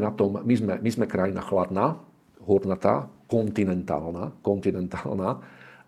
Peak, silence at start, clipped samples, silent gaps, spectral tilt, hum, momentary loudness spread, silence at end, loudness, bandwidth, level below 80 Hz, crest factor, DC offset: -4 dBFS; 0 s; under 0.1%; none; -8 dB/octave; none; 7 LU; 0.15 s; -26 LUFS; 13 kHz; -60 dBFS; 22 dB; under 0.1%